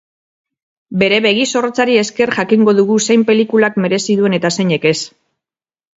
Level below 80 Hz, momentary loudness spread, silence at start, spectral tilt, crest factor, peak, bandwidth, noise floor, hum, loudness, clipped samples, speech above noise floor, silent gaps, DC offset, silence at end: -58 dBFS; 5 LU; 0.9 s; -4.5 dB/octave; 14 dB; 0 dBFS; 8 kHz; -89 dBFS; none; -13 LUFS; under 0.1%; 76 dB; none; under 0.1%; 0.9 s